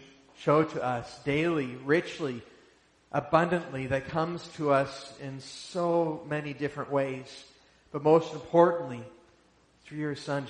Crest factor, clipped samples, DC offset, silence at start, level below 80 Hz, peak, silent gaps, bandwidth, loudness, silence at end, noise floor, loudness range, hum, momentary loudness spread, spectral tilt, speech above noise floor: 22 dB; under 0.1%; under 0.1%; 0 s; -64 dBFS; -8 dBFS; none; 10 kHz; -29 LUFS; 0 s; -63 dBFS; 3 LU; none; 17 LU; -6.5 dB/octave; 35 dB